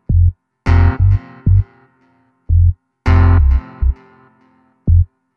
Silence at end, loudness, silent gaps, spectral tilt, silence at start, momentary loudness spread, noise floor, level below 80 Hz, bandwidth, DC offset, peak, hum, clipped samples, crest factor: 0.3 s; -15 LUFS; none; -9.5 dB/octave; 0.1 s; 11 LU; -56 dBFS; -18 dBFS; 4.9 kHz; under 0.1%; -2 dBFS; none; under 0.1%; 12 dB